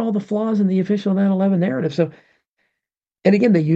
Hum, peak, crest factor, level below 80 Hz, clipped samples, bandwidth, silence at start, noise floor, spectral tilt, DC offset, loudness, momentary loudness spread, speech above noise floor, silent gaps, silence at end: none; -2 dBFS; 16 dB; -68 dBFS; under 0.1%; 7.6 kHz; 0 s; -84 dBFS; -9 dB/octave; under 0.1%; -19 LUFS; 6 LU; 67 dB; 2.48-2.57 s; 0 s